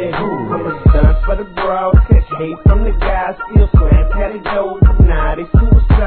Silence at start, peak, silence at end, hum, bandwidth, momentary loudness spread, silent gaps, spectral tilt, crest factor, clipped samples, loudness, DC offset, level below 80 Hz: 0 s; 0 dBFS; 0 s; none; 4.4 kHz; 8 LU; none; -12 dB/octave; 10 dB; 0.5%; -14 LUFS; 0.3%; -12 dBFS